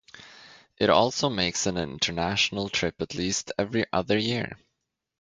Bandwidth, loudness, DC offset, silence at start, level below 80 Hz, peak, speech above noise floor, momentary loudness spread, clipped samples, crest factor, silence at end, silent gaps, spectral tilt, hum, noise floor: 9.6 kHz; -26 LUFS; under 0.1%; 0.15 s; -52 dBFS; -4 dBFS; 55 dB; 8 LU; under 0.1%; 22 dB; 0.65 s; none; -3.5 dB/octave; none; -81 dBFS